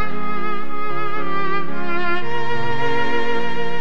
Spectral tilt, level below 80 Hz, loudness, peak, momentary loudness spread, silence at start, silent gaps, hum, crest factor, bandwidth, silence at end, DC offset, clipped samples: -6 dB/octave; -52 dBFS; -24 LUFS; -6 dBFS; 5 LU; 0 s; none; none; 14 dB; over 20 kHz; 0 s; 20%; under 0.1%